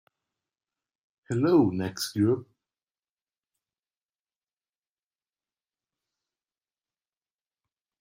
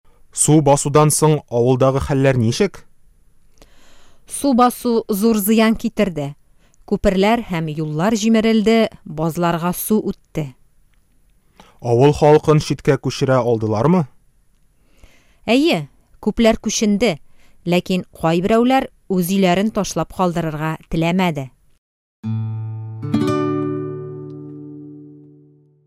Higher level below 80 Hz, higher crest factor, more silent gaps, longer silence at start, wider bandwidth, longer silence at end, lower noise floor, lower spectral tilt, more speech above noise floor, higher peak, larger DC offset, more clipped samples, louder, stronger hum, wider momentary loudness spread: second, -70 dBFS vs -42 dBFS; first, 24 dB vs 16 dB; second, none vs 21.78-22.23 s; first, 1.3 s vs 0.35 s; about the same, 15 kHz vs 16 kHz; first, 5.6 s vs 0.75 s; first, under -90 dBFS vs -55 dBFS; about the same, -6.5 dB/octave vs -5.5 dB/octave; first, over 65 dB vs 39 dB; second, -10 dBFS vs -2 dBFS; neither; neither; second, -26 LUFS vs -17 LUFS; neither; second, 9 LU vs 15 LU